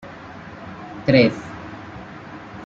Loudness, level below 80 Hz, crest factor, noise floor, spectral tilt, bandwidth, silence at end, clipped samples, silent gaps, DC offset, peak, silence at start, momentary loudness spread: -18 LUFS; -52 dBFS; 22 dB; -38 dBFS; -7.5 dB/octave; 7.8 kHz; 0 s; under 0.1%; none; under 0.1%; -2 dBFS; 0.05 s; 22 LU